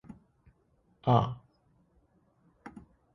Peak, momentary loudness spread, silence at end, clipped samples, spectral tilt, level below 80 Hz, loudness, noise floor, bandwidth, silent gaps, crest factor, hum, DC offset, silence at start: -10 dBFS; 26 LU; 0.35 s; under 0.1%; -9 dB/octave; -62 dBFS; -29 LUFS; -70 dBFS; 6.2 kHz; none; 26 dB; none; under 0.1%; 0.1 s